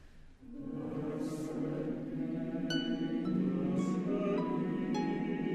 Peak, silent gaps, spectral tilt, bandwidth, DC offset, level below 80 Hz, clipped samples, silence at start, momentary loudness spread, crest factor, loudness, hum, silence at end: -20 dBFS; none; -7 dB/octave; 12.5 kHz; under 0.1%; -58 dBFS; under 0.1%; 0 s; 6 LU; 14 dB; -36 LUFS; none; 0 s